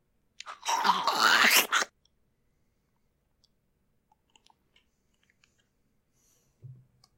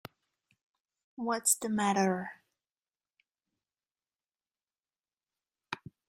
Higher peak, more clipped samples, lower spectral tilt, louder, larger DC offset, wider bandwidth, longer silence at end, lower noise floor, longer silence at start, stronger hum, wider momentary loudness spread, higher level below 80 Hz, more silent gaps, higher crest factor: first, -6 dBFS vs -12 dBFS; neither; second, 0 dB/octave vs -3.5 dB/octave; first, -24 LUFS vs -30 LUFS; neither; about the same, 16 kHz vs 15 kHz; about the same, 0.45 s vs 0.35 s; second, -74 dBFS vs under -90 dBFS; second, 0.45 s vs 1.2 s; neither; first, 20 LU vs 16 LU; about the same, -76 dBFS vs -78 dBFS; neither; about the same, 26 dB vs 26 dB